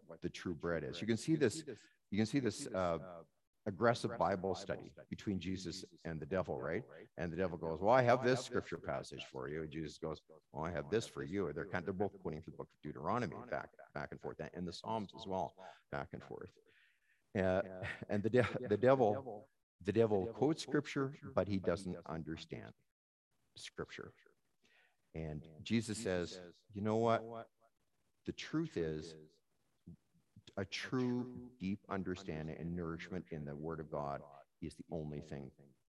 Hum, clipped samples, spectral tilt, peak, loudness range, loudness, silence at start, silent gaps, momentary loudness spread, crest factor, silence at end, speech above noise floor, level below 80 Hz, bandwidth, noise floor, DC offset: none; under 0.1%; -6 dB/octave; -16 dBFS; 9 LU; -40 LUFS; 0.1 s; 3.47-3.53 s, 19.63-19.79 s, 22.92-23.31 s; 16 LU; 24 dB; 0.25 s; 43 dB; -64 dBFS; 12.5 kHz; -83 dBFS; under 0.1%